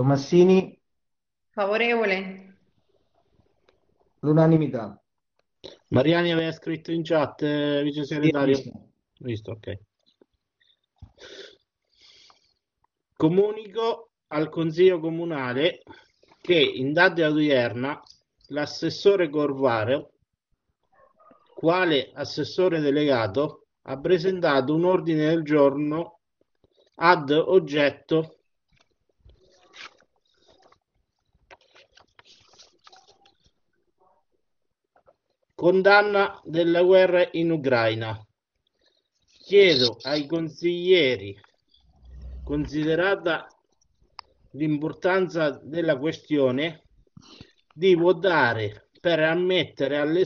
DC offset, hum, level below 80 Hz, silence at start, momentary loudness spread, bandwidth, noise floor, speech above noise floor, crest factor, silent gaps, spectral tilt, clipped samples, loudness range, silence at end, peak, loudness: under 0.1%; none; -56 dBFS; 0 s; 15 LU; 6.8 kHz; -85 dBFS; 62 dB; 24 dB; none; -4 dB/octave; under 0.1%; 7 LU; 0 s; -2 dBFS; -23 LUFS